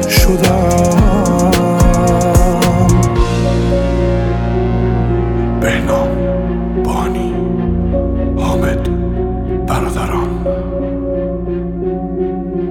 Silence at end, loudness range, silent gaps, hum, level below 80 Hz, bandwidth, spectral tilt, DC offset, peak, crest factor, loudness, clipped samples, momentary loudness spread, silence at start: 0 s; 6 LU; none; none; -20 dBFS; 19.5 kHz; -6.5 dB/octave; under 0.1%; 0 dBFS; 12 dB; -14 LUFS; under 0.1%; 8 LU; 0 s